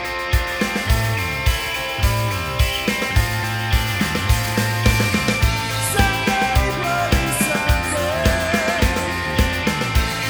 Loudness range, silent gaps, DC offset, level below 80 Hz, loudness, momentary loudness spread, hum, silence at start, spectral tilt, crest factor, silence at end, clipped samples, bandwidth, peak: 2 LU; none; under 0.1%; -24 dBFS; -19 LUFS; 3 LU; none; 0 s; -4 dB/octave; 18 dB; 0 s; under 0.1%; over 20 kHz; -2 dBFS